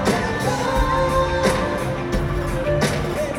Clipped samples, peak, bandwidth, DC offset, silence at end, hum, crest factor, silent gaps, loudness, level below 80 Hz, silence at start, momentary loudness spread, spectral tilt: under 0.1%; -4 dBFS; 16.5 kHz; under 0.1%; 0 s; none; 16 dB; none; -21 LUFS; -30 dBFS; 0 s; 5 LU; -5.5 dB/octave